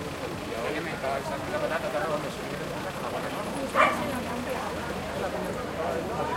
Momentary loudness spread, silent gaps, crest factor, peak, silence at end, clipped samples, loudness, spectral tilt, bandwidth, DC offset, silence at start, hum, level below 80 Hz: 10 LU; none; 22 dB; -8 dBFS; 0 s; under 0.1%; -30 LUFS; -4.5 dB/octave; 16 kHz; under 0.1%; 0 s; none; -50 dBFS